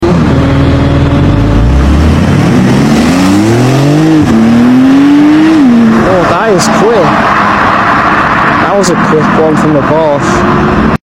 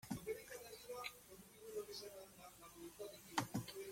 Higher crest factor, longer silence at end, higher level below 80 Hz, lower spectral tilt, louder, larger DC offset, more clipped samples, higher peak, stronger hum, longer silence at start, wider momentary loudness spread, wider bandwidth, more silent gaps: second, 6 dB vs 28 dB; about the same, 0.1 s vs 0 s; first, -18 dBFS vs -74 dBFS; first, -6.5 dB/octave vs -4 dB/octave; first, -6 LUFS vs -50 LUFS; neither; first, 0.5% vs under 0.1%; first, 0 dBFS vs -24 dBFS; neither; about the same, 0 s vs 0 s; second, 3 LU vs 14 LU; about the same, 15.5 kHz vs 16.5 kHz; neither